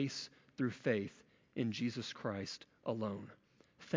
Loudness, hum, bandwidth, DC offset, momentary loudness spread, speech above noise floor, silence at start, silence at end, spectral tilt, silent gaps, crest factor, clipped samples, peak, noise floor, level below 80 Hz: -41 LUFS; none; 7.6 kHz; under 0.1%; 12 LU; 23 dB; 0 s; 0 s; -5.5 dB/octave; none; 20 dB; under 0.1%; -20 dBFS; -63 dBFS; -74 dBFS